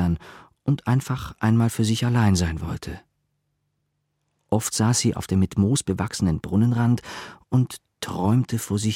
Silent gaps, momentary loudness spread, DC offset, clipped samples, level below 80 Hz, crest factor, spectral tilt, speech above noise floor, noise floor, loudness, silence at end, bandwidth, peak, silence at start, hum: none; 11 LU; under 0.1%; under 0.1%; -44 dBFS; 16 dB; -5.5 dB/octave; 53 dB; -75 dBFS; -23 LUFS; 0 s; 16.5 kHz; -6 dBFS; 0 s; none